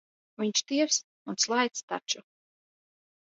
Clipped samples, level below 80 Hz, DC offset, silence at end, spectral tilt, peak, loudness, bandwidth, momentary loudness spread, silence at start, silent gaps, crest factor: under 0.1%; -86 dBFS; under 0.1%; 1.05 s; -1.5 dB/octave; -10 dBFS; -29 LUFS; 8 kHz; 9 LU; 0.4 s; 1.04-1.25 s, 1.83-1.88 s; 22 dB